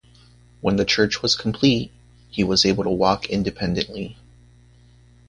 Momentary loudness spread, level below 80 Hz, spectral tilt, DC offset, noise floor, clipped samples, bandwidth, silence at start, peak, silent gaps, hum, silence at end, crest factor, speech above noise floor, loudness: 12 LU; -46 dBFS; -4.5 dB/octave; under 0.1%; -51 dBFS; under 0.1%; 10.5 kHz; 0.65 s; -2 dBFS; none; 60 Hz at -40 dBFS; 1.15 s; 20 dB; 31 dB; -21 LUFS